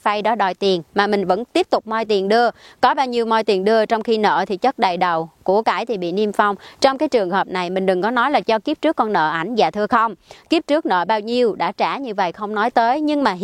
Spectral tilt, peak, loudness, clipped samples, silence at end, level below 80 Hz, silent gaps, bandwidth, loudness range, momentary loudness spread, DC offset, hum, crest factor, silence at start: -5 dB/octave; 0 dBFS; -18 LUFS; under 0.1%; 0 s; -60 dBFS; none; 13 kHz; 1 LU; 4 LU; under 0.1%; none; 18 dB; 0.05 s